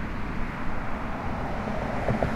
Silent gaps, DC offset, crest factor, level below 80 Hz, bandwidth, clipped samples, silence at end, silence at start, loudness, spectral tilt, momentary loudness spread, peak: none; under 0.1%; 18 dB; -34 dBFS; 9.2 kHz; under 0.1%; 0 s; 0 s; -31 LUFS; -7.5 dB/octave; 5 LU; -10 dBFS